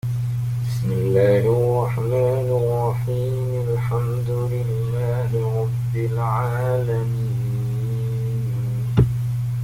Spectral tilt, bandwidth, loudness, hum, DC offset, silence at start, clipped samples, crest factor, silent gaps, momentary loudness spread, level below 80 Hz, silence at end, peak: -8.5 dB/octave; 15.5 kHz; -22 LUFS; 50 Hz at -40 dBFS; under 0.1%; 0.05 s; under 0.1%; 16 dB; none; 6 LU; -42 dBFS; 0 s; -4 dBFS